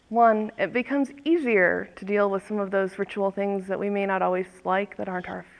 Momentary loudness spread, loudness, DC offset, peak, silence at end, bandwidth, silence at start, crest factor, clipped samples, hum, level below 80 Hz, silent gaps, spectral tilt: 8 LU; -25 LUFS; under 0.1%; -8 dBFS; 0.15 s; 10.5 kHz; 0.1 s; 18 dB; under 0.1%; none; -66 dBFS; none; -7 dB/octave